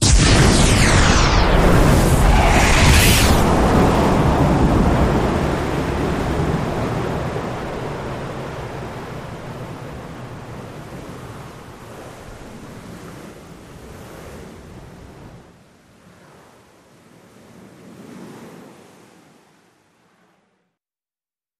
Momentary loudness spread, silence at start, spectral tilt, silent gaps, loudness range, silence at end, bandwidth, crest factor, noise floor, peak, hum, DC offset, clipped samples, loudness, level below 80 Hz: 25 LU; 0 s; -4.5 dB/octave; none; 24 LU; 3.05 s; 15.5 kHz; 18 dB; under -90 dBFS; -2 dBFS; none; under 0.1%; under 0.1%; -16 LUFS; -24 dBFS